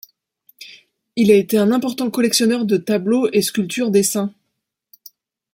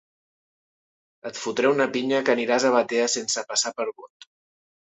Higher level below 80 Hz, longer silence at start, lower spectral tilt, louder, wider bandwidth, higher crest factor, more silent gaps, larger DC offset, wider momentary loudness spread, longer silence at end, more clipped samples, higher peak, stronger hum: first, -62 dBFS vs -72 dBFS; second, 0.6 s vs 1.25 s; first, -4.5 dB/octave vs -2 dB/octave; first, -17 LUFS vs -23 LUFS; first, 17 kHz vs 8.4 kHz; about the same, 16 dB vs 18 dB; neither; neither; first, 14 LU vs 11 LU; first, 1.25 s vs 0.9 s; neither; first, -2 dBFS vs -8 dBFS; neither